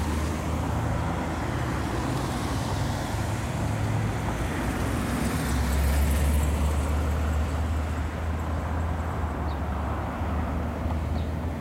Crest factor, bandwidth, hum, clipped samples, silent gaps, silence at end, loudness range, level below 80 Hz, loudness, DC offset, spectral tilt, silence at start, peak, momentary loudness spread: 12 dB; 16 kHz; none; under 0.1%; none; 0 s; 3 LU; -30 dBFS; -28 LUFS; under 0.1%; -6 dB/octave; 0 s; -14 dBFS; 5 LU